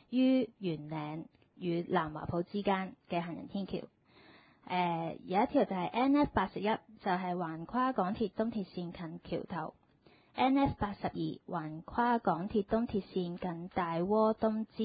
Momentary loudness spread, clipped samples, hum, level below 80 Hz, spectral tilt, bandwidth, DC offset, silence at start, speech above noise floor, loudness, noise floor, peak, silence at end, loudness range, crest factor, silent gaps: 12 LU; under 0.1%; none; -58 dBFS; -5.5 dB/octave; 4.9 kHz; under 0.1%; 0.1 s; 31 dB; -34 LUFS; -65 dBFS; -16 dBFS; 0 s; 4 LU; 18 dB; none